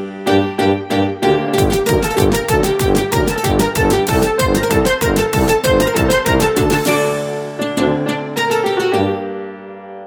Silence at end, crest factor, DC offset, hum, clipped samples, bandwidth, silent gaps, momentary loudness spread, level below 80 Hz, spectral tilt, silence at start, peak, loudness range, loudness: 0 s; 14 dB; under 0.1%; none; under 0.1%; over 20 kHz; none; 7 LU; -30 dBFS; -5 dB/octave; 0 s; 0 dBFS; 2 LU; -15 LUFS